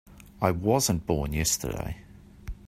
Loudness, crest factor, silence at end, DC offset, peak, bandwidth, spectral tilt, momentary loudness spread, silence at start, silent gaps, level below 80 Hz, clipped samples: -27 LUFS; 24 dB; 0 s; under 0.1%; -6 dBFS; 16 kHz; -4.5 dB/octave; 19 LU; 0.1 s; none; -42 dBFS; under 0.1%